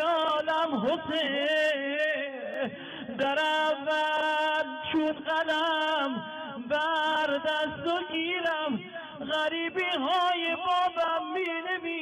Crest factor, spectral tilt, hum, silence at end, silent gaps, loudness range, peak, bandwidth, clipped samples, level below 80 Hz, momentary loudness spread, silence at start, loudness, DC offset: 10 dB; -4 dB/octave; none; 0 s; none; 1 LU; -20 dBFS; 12.5 kHz; under 0.1%; -72 dBFS; 8 LU; 0 s; -28 LUFS; under 0.1%